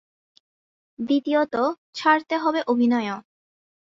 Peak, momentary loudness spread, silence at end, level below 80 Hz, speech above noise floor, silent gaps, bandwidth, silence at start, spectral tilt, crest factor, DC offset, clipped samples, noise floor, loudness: -6 dBFS; 9 LU; 0.75 s; -72 dBFS; over 68 dB; 1.78-1.93 s; 7.4 kHz; 1 s; -5 dB/octave; 18 dB; under 0.1%; under 0.1%; under -90 dBFS; -22 LUFS